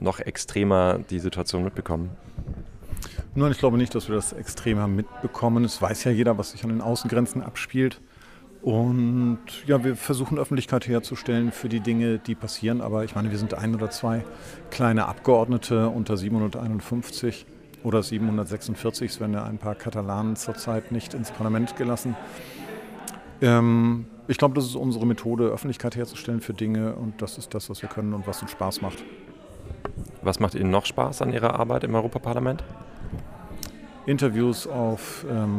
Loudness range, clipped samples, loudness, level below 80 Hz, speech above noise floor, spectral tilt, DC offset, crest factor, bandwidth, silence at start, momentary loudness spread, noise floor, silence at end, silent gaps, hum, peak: 5 LU; under 0.1%; -26 LUFS; -46 dBFS; 24 dB; -6 dB/octave; under 0.1%; 20 dB; 15.5 kHz; 0 s; 15 LU; -48 dBFS; 0 s; none; none; -6 dBFS